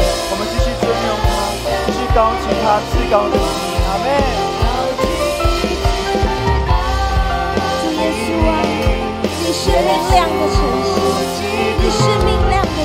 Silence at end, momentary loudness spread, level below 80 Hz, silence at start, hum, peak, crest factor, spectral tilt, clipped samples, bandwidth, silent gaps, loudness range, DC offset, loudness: 0 s; 4 LU; -22 dBFS; 0 s; none; -2 dBFS; 14 dB; -5 dB/octave; under 0.1%; 16 kHz; none; 2 LU; under 0.1%; -16 LUFS